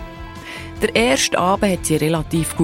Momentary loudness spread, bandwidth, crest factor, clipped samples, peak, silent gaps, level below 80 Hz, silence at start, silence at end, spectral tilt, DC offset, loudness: 16 LU; 16.5 kHz; 16 dB; under 0.1%; -2 dBFS; none; -38 dBFS; 0 s; 0 s; -4 dB/octave; under 0.1%; -18 LUFS